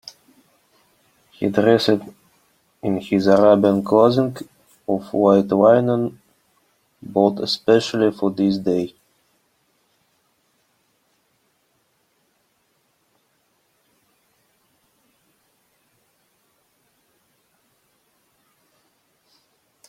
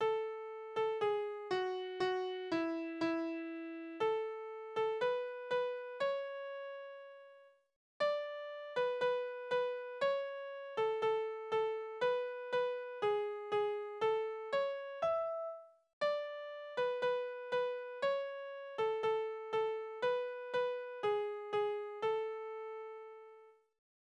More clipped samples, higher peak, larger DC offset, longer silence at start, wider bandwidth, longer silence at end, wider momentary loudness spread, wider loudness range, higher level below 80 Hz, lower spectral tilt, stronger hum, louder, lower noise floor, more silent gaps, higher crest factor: neither; first, -2 dBFS vs -24 dBFS; neither; first, 1.4 s vs 0 s; first, 15.5 kHz vs 9 kHz; first, 11 s vs 0.5 s; first, 15 LU vs 10 LU; first, 8 LU vs 3 LU; first, -64 dBFS vs -82 dBFS; first, -6.5 dB/octave vs -5 dB/octave; neither; first, -18 LUFS vs -38 LUFS; first, -66 dBFS vs -62 dBFS; second, none vs 7.76-8.00 s, 15.93-16.01 s; first, 22 dB vs 14 dB